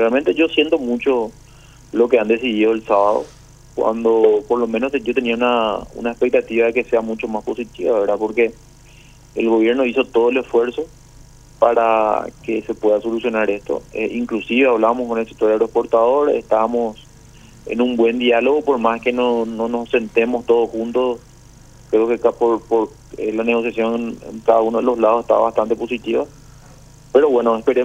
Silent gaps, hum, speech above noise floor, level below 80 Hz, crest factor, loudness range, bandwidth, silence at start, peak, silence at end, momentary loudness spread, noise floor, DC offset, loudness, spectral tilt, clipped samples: none; none; 27 dB; -48 dBFS; 18 dB; 2 LU; 9.2 kHz; 0 s; 0 dBFS; 0 s; 9 LU; -44 dBFS; under 0.1%; -18 LUFS; -5.5 dB/octave; under 0.1%